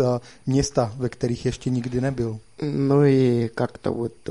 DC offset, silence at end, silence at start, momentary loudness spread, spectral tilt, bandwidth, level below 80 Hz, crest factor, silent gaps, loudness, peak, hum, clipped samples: 0.3%; 0 s; 0 s; 11 LU; -7 dB/octave; 11.5 kHz; -46 dBFS; 16 dB; none; -23 LUFS; -6 dBFS; none; under 0.1%